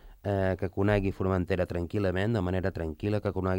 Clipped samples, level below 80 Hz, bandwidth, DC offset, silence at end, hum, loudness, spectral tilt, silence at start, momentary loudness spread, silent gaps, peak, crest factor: under 0.1%; -48 dBFS; 16.5 kHz; under 0.1%; 0 s; none; -30 LUFS; -8.5 dB/octave; 0.05 s; 4 LU; none; -12 dBFS; 18 dB